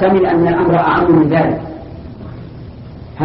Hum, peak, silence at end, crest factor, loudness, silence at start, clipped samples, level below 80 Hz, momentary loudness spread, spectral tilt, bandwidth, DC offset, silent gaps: none; 0 dBFS; 0 s; 14 dB; -12 LUFS; 0 s; under 0.1%; -38 dBFS; 22 LU; -7 dB/octave; 5.6 kHz; under 0.1%; none